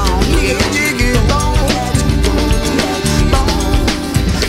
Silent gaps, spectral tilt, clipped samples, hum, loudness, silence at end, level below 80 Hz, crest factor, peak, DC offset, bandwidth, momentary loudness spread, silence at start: none; -4.5 dB/octave; under 0.1%; none; -14 LUFS; 0 s; -16 dBFS; 12 dB; 0 dBFS; under 0.1%; 16 kHz; 2 LU; 0 s